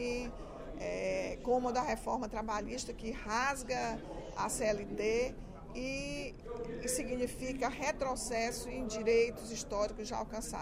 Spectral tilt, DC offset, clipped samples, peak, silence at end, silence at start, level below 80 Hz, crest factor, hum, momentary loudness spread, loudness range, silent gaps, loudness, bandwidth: -3.5 dB/octave; under 0.1%; under 0.1%; -20 dBFS; 0 s; 0 s; -50 dBFS; 16 dB; none; 10 LU; 2 LU; none; -37 LUFS; 16 kHz